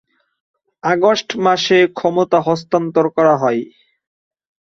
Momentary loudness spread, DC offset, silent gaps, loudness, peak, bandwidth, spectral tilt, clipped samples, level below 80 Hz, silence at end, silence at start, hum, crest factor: 6 LU; under 0.1%; none; -15 LUFS; -2 dBFS; 7.4 kHz; -5 dB/octave; under 0.1%; -62 dBFS; 1.05 s; 0.85 s; none; 16 dB